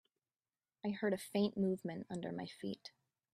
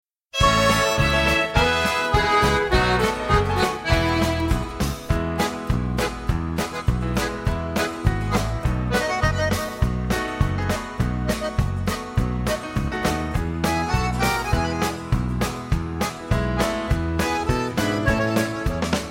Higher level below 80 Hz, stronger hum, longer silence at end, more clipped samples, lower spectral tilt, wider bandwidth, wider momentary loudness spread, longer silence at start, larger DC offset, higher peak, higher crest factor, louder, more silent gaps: second, -80 dBFS vs -30 dBFS; neither; first, 0.45 s vs 0 s; neither; first, -6.5 dB/octave vs -5 dB/octave; second, 14.5 kHz vs 16.5 kHz; first, 10 LU vs 7 LU; first, 0.85 s vs 0.35 s; neither; second, -24 dBFS vs -4 dBFS; about the same, 18 dB vs 18 dB; second, -40 LUFS vs -22 LUFS; neither